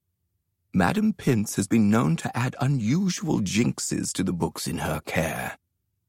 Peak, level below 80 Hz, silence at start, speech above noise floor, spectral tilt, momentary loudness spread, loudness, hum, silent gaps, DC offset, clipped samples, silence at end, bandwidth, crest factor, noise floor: -6 dBFS; -52 dBFS; 0.75 s; 52 dB; -5.5 dB/octave; 7 LU; -25 LUFS; none; none; under 0.1%; under 0.1%; 0.55 s; 16.5 kHz; 18 dB; -76 dBFS